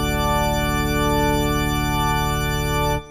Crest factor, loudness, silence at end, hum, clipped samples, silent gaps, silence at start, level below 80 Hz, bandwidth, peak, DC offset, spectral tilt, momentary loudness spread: 12 dB; -21 LUFS; 0 s; none; under 0.1%; none; 0 s; -28 dBFS; 19 kHz; -8 dBFS; under 0.1%; -5 dB/octave; 2 LU